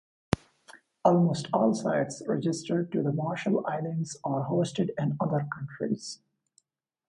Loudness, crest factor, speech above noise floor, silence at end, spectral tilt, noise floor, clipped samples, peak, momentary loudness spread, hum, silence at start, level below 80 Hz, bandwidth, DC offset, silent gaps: -29 LUFS; 24 dB; 42 dB; 0.95 s; -6.5 dB/octave; -70 dBFS; under 0.1%; -6 dBFS; 8 LU; none; 0.3 s; -60 dBFS; 11.5 kHz; under 0.1%; none